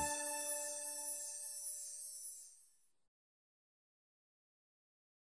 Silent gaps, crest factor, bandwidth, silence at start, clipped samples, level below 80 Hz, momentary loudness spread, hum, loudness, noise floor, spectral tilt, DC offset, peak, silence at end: none; 20 dB; 11 kHz; 0 s; under 0.1%; -76 dBFS; 10 LU; none; -41 LUFS; -71 dBFS; -0.5 dB/octave; under 0.1%; -26 dBFS; 2.6 s